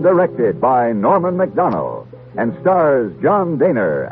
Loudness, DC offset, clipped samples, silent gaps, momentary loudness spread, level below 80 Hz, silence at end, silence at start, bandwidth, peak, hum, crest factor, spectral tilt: -16 LUFS; under 0.1%; under 0.1%; none; 8 LU; -54 dBFS; 0 s; 0 s; 4 kHz; -2 dBFS; none; 14 dB; -8.5 dB/octave